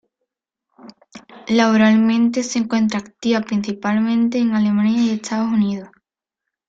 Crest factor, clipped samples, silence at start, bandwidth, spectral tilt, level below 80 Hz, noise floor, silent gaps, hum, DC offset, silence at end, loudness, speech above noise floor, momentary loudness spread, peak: 16 dB; under 0.1%; 0.85 s; 7.8 kHz; -5.5 dB/octave; -60 dBFS; -83 dBFS; none; none; under 0.1%; 0.8 s; -18 LUFS; 66 dB; 8 LU; -2 dBFS